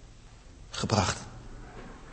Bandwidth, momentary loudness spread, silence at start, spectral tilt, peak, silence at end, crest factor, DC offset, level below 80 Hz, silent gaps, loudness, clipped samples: 8.8 kHz; 26 LU; 0 s; -4 dB/octave; -8 dBFS; 0 s; 26 dB; under 0.1%; -48 dBFS; none; -30 LUFS; under 0.1%